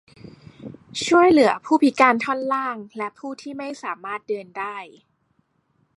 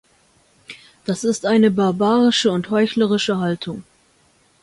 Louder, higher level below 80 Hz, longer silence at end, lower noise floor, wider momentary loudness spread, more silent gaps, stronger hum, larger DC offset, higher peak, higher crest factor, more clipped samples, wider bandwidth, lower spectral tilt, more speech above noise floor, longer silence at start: second, -21 LUFS vs -18 LUFS; about the same, -64 dBFS vs -60 dBFS; first, 1.1 s vs 0.8 s; first, -67 dBFS vs -58 dBFS; about the same, 18 LU vs 19 LU; neither; neither; neither; about the same, -2 dBFS vs -4 dBFS; about the same, 20 dB vs 16 dB; neither; about the same, 11.5 kHz vs 11.5 kHz; about the same, -4 dB/octave vs -5 dB/octave; first, 46 dB vs 40 dB; about the same, 0.6 s vs 0.7 s